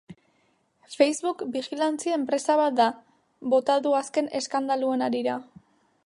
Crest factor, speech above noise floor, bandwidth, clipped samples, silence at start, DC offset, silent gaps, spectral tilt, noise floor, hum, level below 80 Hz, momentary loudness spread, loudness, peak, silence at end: 20 dB; 43 dB; 11.5 kHz; under 0.1%; 0.1 s; under 0.1%; none; -3.5 dB/octave; -68 dBFS; none; -78 dBFS; 9 LU; -25 LUFS; -6 dBFS; 0.65 s